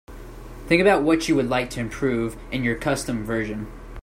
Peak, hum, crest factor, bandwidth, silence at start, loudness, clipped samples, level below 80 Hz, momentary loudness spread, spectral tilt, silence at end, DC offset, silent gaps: -4 dBFS; none; 18 dB; 16 kHz; 0.1 s; -22 LUFS; under 0.1%; -40 dBFS; 21 LU; -5.5 dB/octave; 0 s; under 0.1%; none